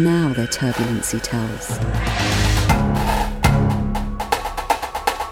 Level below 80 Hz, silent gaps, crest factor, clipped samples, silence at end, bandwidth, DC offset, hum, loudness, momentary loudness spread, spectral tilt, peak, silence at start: -26 dBFS; none; 18 dB; under 0.1%; 0 s; 17.5 kHz; under 0.1%; none; -20 LUFS; 6 LU; -5 dB/octave; -2 dBFS; 0 s